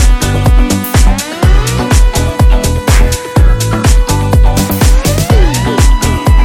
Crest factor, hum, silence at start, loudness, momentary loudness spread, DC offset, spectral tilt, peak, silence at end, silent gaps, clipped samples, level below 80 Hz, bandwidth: 8 dB; none; 0 s; -10 LUFS; 2 LU; under 0.1%; -5 dB/octave; 0 dBFS; 0 s; none; under 0.1%; -10 dBFS; 17.5 kHz